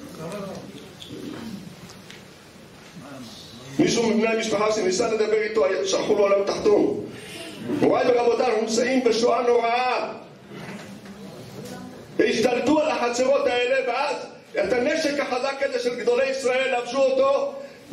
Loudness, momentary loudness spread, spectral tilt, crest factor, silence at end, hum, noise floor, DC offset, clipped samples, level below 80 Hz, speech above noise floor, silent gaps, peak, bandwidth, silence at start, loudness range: -22 LUFS; 20 LU; -4 dB/octave; 16 dB; 0 s; none; -46 dBFS; under 0.1%; under 0.1%; -60 dBFS; 24 dB; none; -8 dBFS; 14 kHz; 0 s; 5 LU